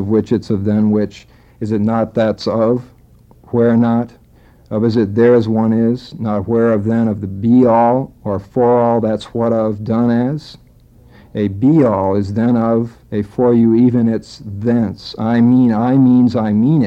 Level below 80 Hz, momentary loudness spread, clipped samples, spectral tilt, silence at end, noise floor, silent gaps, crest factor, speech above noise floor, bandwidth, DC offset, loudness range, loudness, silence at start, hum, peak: -48 dBFS; 10 LU; under 0.1%; -9 dB/octave; 0 s; -46 dBFS; none; 12 dB; 32 dB; 7.8 kHz; under 0.1%; 3 LU; -15 LUFS; 0 s; none; -2 dBFS